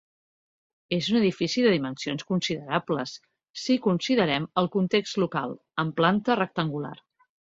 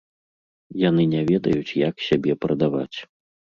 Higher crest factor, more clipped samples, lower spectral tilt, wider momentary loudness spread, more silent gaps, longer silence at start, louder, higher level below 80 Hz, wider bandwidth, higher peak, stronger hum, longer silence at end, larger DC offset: about the same, 20 dB vs 18 dB; neither; second, -5.5 dB/octave vs -8 dB/octave; about the same, 9 LU vs 11 LU; first, 3.50-3.54 s vs none; first, 0.9 s vs 0.7 s; second, -26 LUFS vs -22 LUFS; second, -64 dBFS vs -54 dBFS; about the same, 7.8 kHz vs 7.2 kHz; about the same, -6 dBFS vs -6 dBFS; neither; about the same, 0.6 s vs 0.55 s; neither